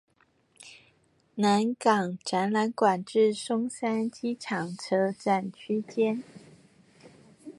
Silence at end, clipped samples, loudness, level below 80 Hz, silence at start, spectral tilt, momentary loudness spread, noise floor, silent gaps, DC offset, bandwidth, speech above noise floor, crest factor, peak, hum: 0.05 s; under 0.1%; -28 LUFS; -76 dBFS; 0.6 s; -5.5 dB/octave; 11 LU; -67 dBFS; none; under 0.1%; 11.5 kHz; 40 dB; 20 dB; -8 dBFS; none